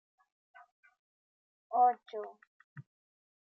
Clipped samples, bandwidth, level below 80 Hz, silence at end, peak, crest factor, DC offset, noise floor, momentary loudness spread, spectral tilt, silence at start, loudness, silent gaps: under 0.1%; 4.3 kHz; under -90 dBFS; 0.65 s; -18 dBFS; 20 dB; under 0.1%; under -90 dBFS; 27 LU; -7.5 dB/octave; 1.7 s; -32 LUFS; 2.47-2.76 s